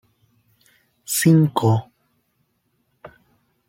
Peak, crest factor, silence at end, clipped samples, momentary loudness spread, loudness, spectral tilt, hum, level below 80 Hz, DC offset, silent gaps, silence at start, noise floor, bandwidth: -4 dBFS; 20 dB; 0.6 s; under 0.1%; 9 LU; -18 LUFS; -6 dB/octave; none; -62 dBFS; under 0.1%; none; 1.1 s; -69 dBFS; 16.5 kHz